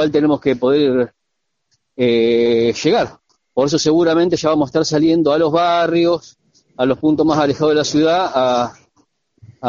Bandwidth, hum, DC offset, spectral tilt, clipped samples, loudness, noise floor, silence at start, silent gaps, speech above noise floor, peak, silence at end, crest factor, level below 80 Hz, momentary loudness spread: 7.6 kHz; none; under 0.1%; -4.5 dB/octave; under 0.1%; -16 LUFS; -75 dBFS; 0 s; none; 61 dB; 0 dBFS; 0 s; 16 dB; -52 dBFS; 6 LU